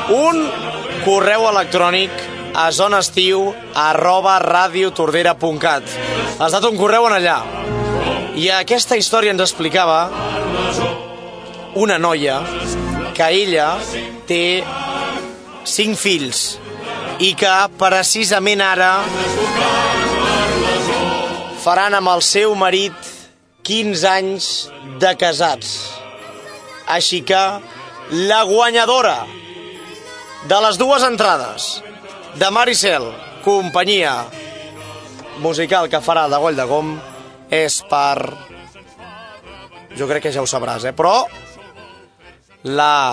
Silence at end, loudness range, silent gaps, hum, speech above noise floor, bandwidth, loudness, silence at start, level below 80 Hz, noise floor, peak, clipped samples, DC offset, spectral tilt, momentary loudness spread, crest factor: 0 s; 5 LU; none; none; 31 dB; 11 kHz; -15 LUFS; 0 s; -44 dBFS; -46 dBFS; 0 dBFS; under 0.1%; under 0.1%; -2.5 dB/octave; 19 LU; 16 dB